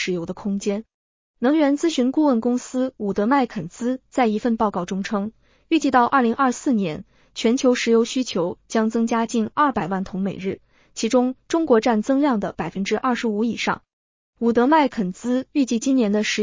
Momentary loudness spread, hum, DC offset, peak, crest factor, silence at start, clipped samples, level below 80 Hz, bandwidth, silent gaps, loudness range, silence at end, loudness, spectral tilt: 9 LU; none; under 0.1%; -4 dBFS; 16 dB; 0 s; under 0.1%; -56 dBFS; 7.6 kHz; 0.94-1.34 s, 13.93-14.33 s; 2 LU; 0 s; -21 LUFS; -5 dB/octave